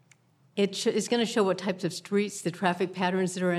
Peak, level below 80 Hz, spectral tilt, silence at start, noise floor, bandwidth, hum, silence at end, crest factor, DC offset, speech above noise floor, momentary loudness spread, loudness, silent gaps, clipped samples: -8 dBFS; -82 dBFS; -4.5 dB/octave; 0.55 s; -62 dBFS; 14 kHz; none; 0 s; 20 dB; under 0.1%; 35 dB; 5 LU; -28 LUFS; none; under 0.1%